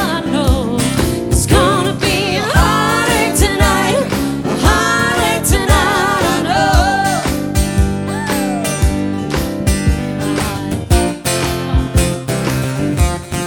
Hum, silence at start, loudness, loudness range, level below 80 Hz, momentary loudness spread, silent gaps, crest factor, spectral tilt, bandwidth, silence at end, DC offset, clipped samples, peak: none; 0 s; -14 LUFS; 4 LU; -22 dBFS; 6 LU; none; 12 dB; -4.5 dB/octave; 19 kHz; 0 s; under 0.1%; under 0.1%; -2 dBFS